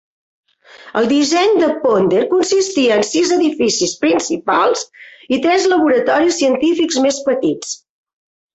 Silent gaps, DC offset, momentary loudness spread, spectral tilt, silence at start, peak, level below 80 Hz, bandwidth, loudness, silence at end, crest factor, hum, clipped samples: none; under 0.1%; 7 LU; -3 dB/octave; 0.85 s; -2 dBFS; -58 dBFS; 8.2 kHz; -15 LUFS; 0.8 s; 12 dB; none; under 0.1%